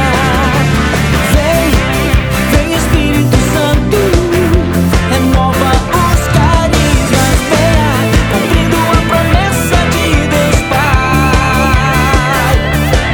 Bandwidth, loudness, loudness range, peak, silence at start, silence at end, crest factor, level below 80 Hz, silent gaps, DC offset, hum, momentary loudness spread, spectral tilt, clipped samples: over 20 kHz; -10 LUFS; 1 LU; 0 dBFS; 0 s; 0 s; 10 dB; -16 dBFS; none; under 0.1%; none; 2 LU; -5 dB/octave; under 0.1%